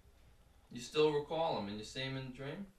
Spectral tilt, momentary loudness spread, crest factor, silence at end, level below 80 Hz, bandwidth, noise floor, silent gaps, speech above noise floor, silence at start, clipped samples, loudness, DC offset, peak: -5 dB/octave; 13 LU; 18 dB; 0.05 s; -64 dBFS; 13 kHz; -64 dBFS; none; 26 dB; 0.7 s; under 0.1%; -38 LUFS; under 0.1%; -20 dBFS